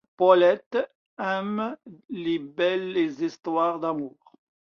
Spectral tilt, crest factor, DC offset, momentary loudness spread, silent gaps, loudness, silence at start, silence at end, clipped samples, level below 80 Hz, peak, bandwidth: -6.5 dB/octave; 20 dB; under 0.1%; 14 LU; 0.66-0.71 s, 0.95-1.17 s; -25 LUFS; 0.2 s; 0.7 s; under 0.1%; -72 dBFS; -4 dBFS; 6.8 kHz